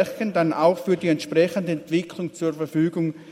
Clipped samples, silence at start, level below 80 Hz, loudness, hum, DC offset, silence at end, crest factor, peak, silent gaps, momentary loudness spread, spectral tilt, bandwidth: under 0.1%; 0 s; -68 dBFS; -23 LUFS; none; under 0.1%; 0 s; 18 dB; -6 dBFS; none; 7 LU; -6.5 dB/octave; 16 kHz